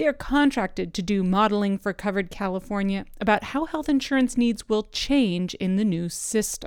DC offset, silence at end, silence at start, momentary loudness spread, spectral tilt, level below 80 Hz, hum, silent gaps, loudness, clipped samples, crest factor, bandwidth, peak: under 0.1%; 0 s; 0 s; 6 LU; -5 dB/octave; -44 dBFS; none; none; -24 LUFS; under 0.1%; 16 dB; 18 kHz; -6 dBFS